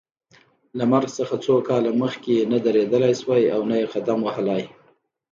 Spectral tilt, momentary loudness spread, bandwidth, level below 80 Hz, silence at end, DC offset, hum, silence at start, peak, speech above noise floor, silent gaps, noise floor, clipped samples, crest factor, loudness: -6.5 dB/octave; 6 LU; 7.6 kHz; -68 dBFS; 0.65 s; under 0.1%; none; 0.75 s; -6 dBFS; 41 dB; none; -61 dBFS; under 0.1%; 16 dB; -21 LUFS